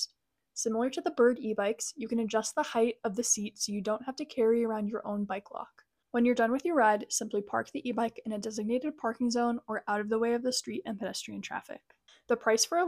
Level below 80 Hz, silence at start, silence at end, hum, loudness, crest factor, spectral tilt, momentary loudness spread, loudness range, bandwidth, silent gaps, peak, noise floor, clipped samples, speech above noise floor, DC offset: -72 dBFS; 0 s; 0 s; none; -31 LUFS; 18 dB; -3 dB/octave; 11 LU; 3 LU; 15.5 kHz; none; -14 dBFS; -72 dBFS; under 0.1%; 42 dB; under 0.1%